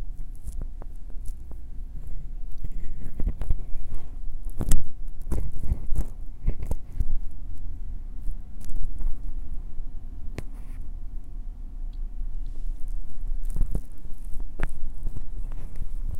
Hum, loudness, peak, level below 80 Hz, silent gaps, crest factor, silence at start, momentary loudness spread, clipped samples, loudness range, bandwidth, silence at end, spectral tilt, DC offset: none; -38 LUFS; -2 dBFS; -28 dBFS; none; 18 dB; 0 s; 9 LU; under 0.1%; 6 LU; 10 kHz; 0 s; -6 dB/octave; under 0.1%